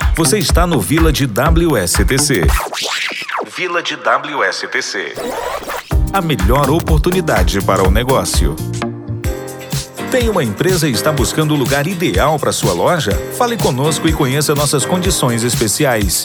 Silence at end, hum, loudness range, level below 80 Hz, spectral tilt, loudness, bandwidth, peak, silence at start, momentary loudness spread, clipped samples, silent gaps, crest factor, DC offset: 0 s; none; 3 LU; -22 dBFS; -4.5 dB/octave; -15 LUFS; over 20 kHz; 0 dBFS; 0 s; 9 LU; under 0.1%; none; 14 dB; under 0.1%